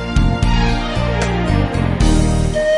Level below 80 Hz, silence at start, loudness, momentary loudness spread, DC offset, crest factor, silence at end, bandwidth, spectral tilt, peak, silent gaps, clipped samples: -20 dBFS; 0 s; -17 LUFS; 3 LU; under 0.1%; 12 dB; 0 s; 11.5 kHz; -6 dB/octave; -2 dBFS; none; under 0.1%